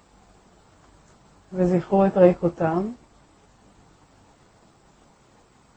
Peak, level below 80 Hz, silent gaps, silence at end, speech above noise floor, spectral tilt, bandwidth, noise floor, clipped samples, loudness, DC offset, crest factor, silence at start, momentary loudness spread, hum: -4 dBFS; -54 dBFS; none; 2.85 s; 37 dB; -9 dB/octave; 8.4 kHz; -57 dBFS; under 0.1%; -21 LUFS; under 0.1%; 22 dB; 1.5 s; 17 LU; none